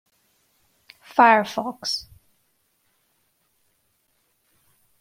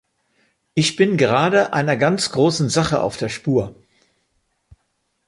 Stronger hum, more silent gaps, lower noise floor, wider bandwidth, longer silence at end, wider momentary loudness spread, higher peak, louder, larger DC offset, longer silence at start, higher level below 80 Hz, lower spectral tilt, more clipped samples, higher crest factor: neither; neither; about the same, -69 dBFS vs -70 dBFS; first, 16 kHz vs 11.5 kHz; first, 3 s vs 1.55 s; first, 13 LU vs 7 LU; about the same, -2 dBFS vs -2 dBFS; about the same, -20 LUFS vs -18 LUFS; neither; first, 1.15 s vs 0.75 s; second, -68 dBFS vs -52 dBFS; second, -3 dB/octave vs -5 dB/octave; neither; first, 24 dB vs 18 dB